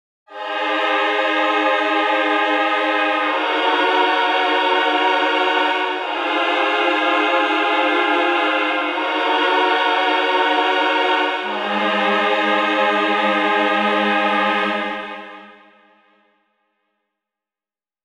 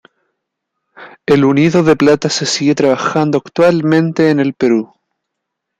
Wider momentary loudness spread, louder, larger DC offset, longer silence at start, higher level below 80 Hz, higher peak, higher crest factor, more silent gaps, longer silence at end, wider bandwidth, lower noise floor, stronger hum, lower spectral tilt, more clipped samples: about the same, 4 LU vs 5 LU; second, -17 LUFS vs -12 LUFS; neither; second, 0.3 s vs 1 s; second, -70 dBFS vs -54 dBFS; second, -4 dBFS vs 0 dBFS; about the same, 14 dB vs 14 dB; neither; first, 2.55 s vs 0.95 s; first, 10.5 kHz vs 9.4 kHz; first, under -90 dBFS vs -76 dBFS; neither; second, -3.5 dB/octave vs -5.5 dB/octave; neither